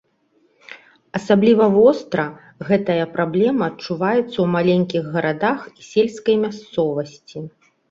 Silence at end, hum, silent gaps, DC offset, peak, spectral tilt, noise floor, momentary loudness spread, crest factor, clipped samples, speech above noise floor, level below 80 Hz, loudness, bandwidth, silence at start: 0.4 s; none; none; under 0.1%; -2 dBFS; -7 dB/octave; -61 dBFS; 15 LU; 18 dB; under 0.1%; 43 dB; -60 dBFS; -19 LUFS; 7.8 kHz; 0.7 s